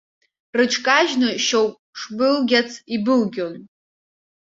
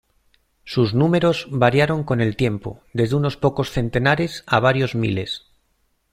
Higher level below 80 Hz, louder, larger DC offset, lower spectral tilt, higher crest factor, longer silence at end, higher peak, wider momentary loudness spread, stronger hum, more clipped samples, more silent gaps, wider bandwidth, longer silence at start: second, -66 dBFS vs -46 dBFS; about the same, -19 LUFS vs -20 LUFS; neither; second, -3 dB/octave vs -7 dB/octave; about the same, 20 dB vs 20 dB; about the same, 0.75 s vs 0.75 s; about the same, -2 dBFS vs -2 dBFS; first, 14 LU vs 9 LU; neither; neither; first, 1.79-1.93 s vs none; second, 7.8 kHz vs 13.5 kHz; about the same, 0.55 s vs 0.65 s